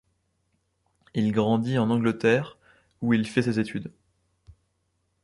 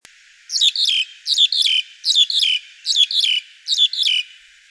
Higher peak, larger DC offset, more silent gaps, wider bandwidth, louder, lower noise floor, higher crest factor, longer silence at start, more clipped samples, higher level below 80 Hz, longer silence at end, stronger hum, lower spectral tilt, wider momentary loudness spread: about the same, -6 dBFS vs -4 dBFS; neither; neither; about the same, 11.5 kHz vs 11 kHz; second, -25 LUFS vs -15 LUFS; first, -74 dBFS vs -43 dBFS; first, 20 dB vs 14 dB; first, 1.15 s vs 0.5 s; neither; first, -62 dBFS vs -80 dBFS; first, 1.35 s vs 0.45 s; neither; first, -7 dB/octave vs 8.5 dB/octave; first, 11 LU vs 8 LU